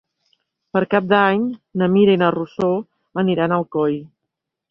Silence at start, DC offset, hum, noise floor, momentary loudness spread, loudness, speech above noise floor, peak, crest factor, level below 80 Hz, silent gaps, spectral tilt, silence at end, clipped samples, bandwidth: 0.75 s; under 0.1%; none; -80 dBFS; 9 LU; -18 LUFS; 63 dB; -2 dBFS; 18 dB; -60 dBFS; none; -9 dB/octave; 0.65 s; under 0.1%; 5.8 kHz